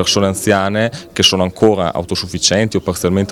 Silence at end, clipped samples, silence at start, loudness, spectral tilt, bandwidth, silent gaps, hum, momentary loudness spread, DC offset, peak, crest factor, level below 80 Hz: 0 s; 0.2%; 0 s; -15 LUFS; -4 dB/octave; 18.5 kHz; none; none; 6 LU; under 0.1%; 0 dBFS; 14 dB; -46 dBFS